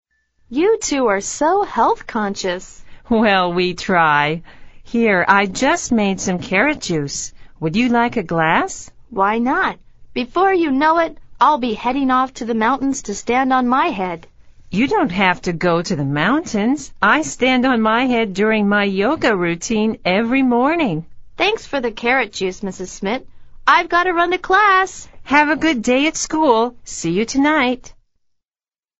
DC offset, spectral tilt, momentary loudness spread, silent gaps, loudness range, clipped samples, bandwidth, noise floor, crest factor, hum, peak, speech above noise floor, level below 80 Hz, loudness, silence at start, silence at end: under 0.1%; -4.5 dB/octave; 9 LU; none; 3 LU; under 0.1%; 8.2 kHz; under -90 dBFS; 18 dB; none; 0 dBFS; over 73 dB; -44 dBFS; -17 LUFS; 0.5 s; 1.1 s